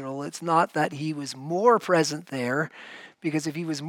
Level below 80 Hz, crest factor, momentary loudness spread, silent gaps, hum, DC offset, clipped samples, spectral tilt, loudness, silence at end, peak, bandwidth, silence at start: -78 dBFS; 20 dB; 12 LU; none; none; under 0.1%; under 0.1%; -5 dB/octave; -26 LUFS; 0 s; -6 dBFS; 16.5 kHz; 0 s